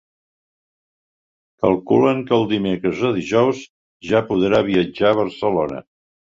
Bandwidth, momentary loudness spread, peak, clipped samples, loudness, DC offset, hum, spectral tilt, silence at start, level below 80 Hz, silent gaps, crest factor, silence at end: 7.6 kHz; 6 LU; -2 dBFS; under 0.1%; -18 LUFS; under 0.1%; none; -7 dB/octave; 1.6 s; -52 dBFS; 3.69-4.00 s; 18 dB; 0.6 s